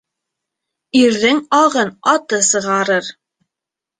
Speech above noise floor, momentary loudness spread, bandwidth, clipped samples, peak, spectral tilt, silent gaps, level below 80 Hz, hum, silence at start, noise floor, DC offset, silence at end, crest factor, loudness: 71 dB; 5 LU; 9.6 kHz; under 0.1%; -2 dBFS; -2.5 dB/octave; none; -62 dBFS; none; 0.95 s; -85 dBFS; under 0.1%; 0.9 s; 16 dB; -14 LUFS